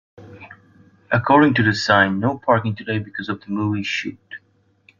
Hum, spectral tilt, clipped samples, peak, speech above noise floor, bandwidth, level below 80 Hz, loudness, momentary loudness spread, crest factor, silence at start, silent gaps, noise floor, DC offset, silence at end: none; -6 dB/octave; under 0.1%; -2 dBFS; 38 dB; 7.4 kHz; -58 dBFS; -19 LUFS; 16 LU; 18 dB; 0.2 s; none; -57 dBFS; under 0.1%; 0.6 s